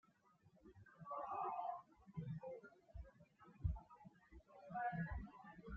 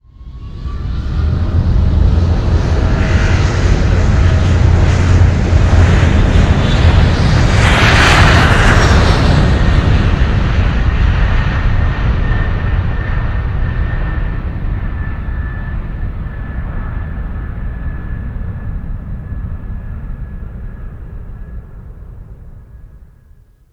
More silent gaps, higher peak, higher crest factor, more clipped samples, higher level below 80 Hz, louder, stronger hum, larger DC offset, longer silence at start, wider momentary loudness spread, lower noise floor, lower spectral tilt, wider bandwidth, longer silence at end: neither; second, -30 dBFS vs 0 dBFS; first, 22 dB vs 12 dB; second, under 0.1% vs 0.2%; second, -60 dBFS vs -16 dBFS; second, -50 LUFS vs -13 LUFS; neither; neither; first, 0.45 s vs 0.2 s; about the same, 20 LU vs 18 LU; first, -74 dBFS vs -44 dBFS; first, -7.5 dB/octave vs -6 dB/octave; second, 7 kHz vs 10 kHz; second, 0 s vs 0.7 s